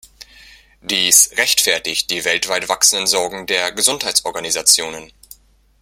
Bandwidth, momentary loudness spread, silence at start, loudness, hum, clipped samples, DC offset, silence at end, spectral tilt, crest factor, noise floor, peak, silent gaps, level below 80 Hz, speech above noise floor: 17 kHz; 10 LU; 0.2 s; -14 LUFS; none; under 0.1%; under 0.1%; 0.75 s; 1 dB/octave; 18 dB; -46 dBFS; 0 dBFS; none; -54 dBFS; 29 dB